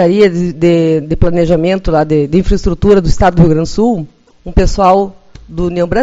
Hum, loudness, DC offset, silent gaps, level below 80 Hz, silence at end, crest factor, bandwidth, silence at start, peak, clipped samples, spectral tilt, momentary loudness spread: none; -11 LUFS; under 0.1%; none; -20 dBFS; 0 s; 10 dB; 8 kHz; 0 s; 0 dBFS; 0.5%; -7.5 dB/octave; 8 LU